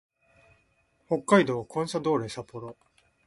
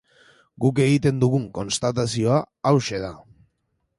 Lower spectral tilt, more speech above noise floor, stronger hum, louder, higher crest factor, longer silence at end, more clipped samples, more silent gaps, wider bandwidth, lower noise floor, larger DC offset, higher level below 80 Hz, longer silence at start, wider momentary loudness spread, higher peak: about the same, -5.5 dB/octave vs -6 dB/octave; second, 42 dB vs 52 dB; neither; second, -27 LUFS vs -22 LUFS; about the same, 22 dB vs 18 dB; second, 0.55 s vs 0.75 s; neither; neither; about the same, 11.5 kHz vs 11.5 kHz; second, -69 dBFS vs -73 dBFS; neither; second, -66 dBFS vs -52 dBFS; first, 1.1 s vs 0.6 s; first, 19 LU vs 8 LU; about the same, -8 dBFS vs -6 dBFS